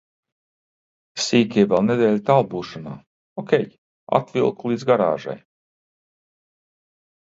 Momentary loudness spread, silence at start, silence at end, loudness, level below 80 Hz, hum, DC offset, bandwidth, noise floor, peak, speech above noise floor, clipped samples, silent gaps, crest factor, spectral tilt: 18 LU; 1.15 s; 1.9 s; -20 LUFS; -62 dBFS; none; under 0.1%; 8 kHz; under -90 dBFS; 0 dBFS; over 70 dB; under 0.1%; 3.07-3.36 s, 3.78-4.07 s; 22 dB; -5.5 dB/octave